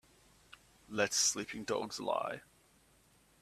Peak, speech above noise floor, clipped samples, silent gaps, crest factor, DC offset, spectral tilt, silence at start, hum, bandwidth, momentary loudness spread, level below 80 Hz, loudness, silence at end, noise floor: -14 dBFS; 32 dB; under 0.1%; none; 24 dB; under 0.1%; -1.5 dB/octave; 0.5 s; none; 15.5 kHz; 13 LU; -72 dBFS; -35 LUFS; 1 s; -68 dBFS